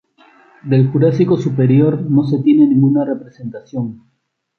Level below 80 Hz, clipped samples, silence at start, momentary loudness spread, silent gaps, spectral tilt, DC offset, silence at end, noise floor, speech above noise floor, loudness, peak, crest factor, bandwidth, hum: -56 dBFS; under 0.1%; 0.65 s; 15 LU; none; -10.5 dB/octave; under 0.1%; 0.65 s; -49 dBFS; 35 dB; -14 LUFS; -2 dBFS; 12 dB; 6.4 kHz; none